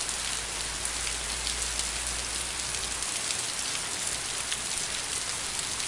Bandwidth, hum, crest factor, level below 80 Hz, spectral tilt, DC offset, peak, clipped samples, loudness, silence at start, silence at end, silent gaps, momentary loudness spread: 11.5 kHz; none; 22 dB; -46 dBFS; 0 dB/octave; under 0.1%; -10 dBFS; under 0.1%; -29 LUFS; 0 s; 0 s; none; 1 LU